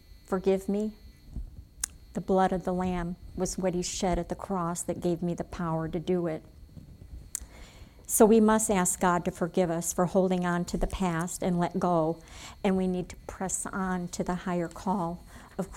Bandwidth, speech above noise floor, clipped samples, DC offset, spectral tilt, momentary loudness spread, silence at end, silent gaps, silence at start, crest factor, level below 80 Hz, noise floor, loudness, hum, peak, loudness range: 18.5 kHz; 21 dB; under 0.1%; under 0.1%; -5.5 dB/octave; 14 LU; 0 s; none; 0.15 s; 22 dB; -46 dBFS; -49 dBFS; -29 LUFS; none; -8 dBFS; 6 LU